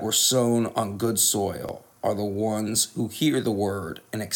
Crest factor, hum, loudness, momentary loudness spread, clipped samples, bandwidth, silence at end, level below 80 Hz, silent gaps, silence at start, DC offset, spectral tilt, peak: 16 dB; none; -24 LUFS; 13 LU; under 0.1%; 19.5 kHz; 0 s; -62 dBFS; none; 0 s; under 0.1%; -3.5 dB/octave; -8 dBFS